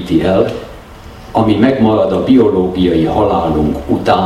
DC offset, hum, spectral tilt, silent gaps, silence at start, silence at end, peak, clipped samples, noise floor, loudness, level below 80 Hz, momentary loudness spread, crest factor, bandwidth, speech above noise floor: under 0.1%; none; -8 dB/octave; none; 0 s; 0 s; 0 dBFS; under 0.1%; -33 dBFS; -12 LUFS; -32 dBFS; 7 LU; 12 dB; 12.5 kHz; 21 dB